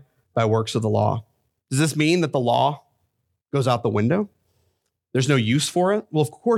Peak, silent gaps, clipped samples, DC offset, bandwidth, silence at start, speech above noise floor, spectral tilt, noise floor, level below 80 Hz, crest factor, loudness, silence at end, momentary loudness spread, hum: -6 dBFS; none; under 0.1%; under 0.1%; 15 kHz; 0.35 s; 52 dB; -5.5 dB/octave; -73 dBFS; -64 dBFS; 18 dB; -22 LUFS; 0 s; 8 LU; none